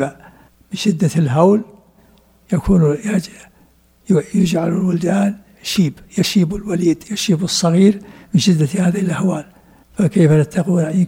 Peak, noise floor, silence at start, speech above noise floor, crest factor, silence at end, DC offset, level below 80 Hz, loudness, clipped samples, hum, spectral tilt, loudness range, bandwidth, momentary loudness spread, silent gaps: 0 dBFS; -52 dBFS; 0 s; 37 dB; 16 dB; 0 s; under 0.1%; -42 dBFS; -16 LUFS; under 0.1%; none; -6 dB/octave; 3 LU; 16.5 kHz; 9 LU; none